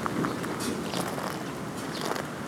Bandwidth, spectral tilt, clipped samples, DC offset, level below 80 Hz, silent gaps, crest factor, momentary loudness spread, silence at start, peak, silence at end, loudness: 19 kHz; -4.5 dB/octave; under 0.1%; under 0.1%; -58 dBFS; none; 20 dB; 4 LU; 0 s; -12 dBFS; 0 s; -32 LUFS